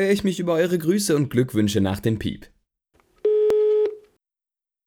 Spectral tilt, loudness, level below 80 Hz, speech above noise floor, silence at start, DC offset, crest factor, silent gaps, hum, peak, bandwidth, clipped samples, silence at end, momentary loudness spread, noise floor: -6 dB/octave; -22 LUFS; -52 dBFS; 66 dB; 0 s; under 0.1%; 16 dB; none; none; -8 dBFS; 18 kHz; under 0.1%; 0.9 s; 8 LU; -87 dBFS